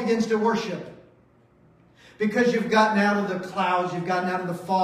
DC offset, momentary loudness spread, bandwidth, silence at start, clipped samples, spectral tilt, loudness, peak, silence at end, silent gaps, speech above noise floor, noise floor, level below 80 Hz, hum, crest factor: under 0.1%; 9 LU; 14 kHz; 0 s; under 0.1%; -5.5 dB/octave; -24 LUFS; -6 dBFS; 0 s; none; 35 dB; -58 dBFS; -66 dBFS; none; 18 dB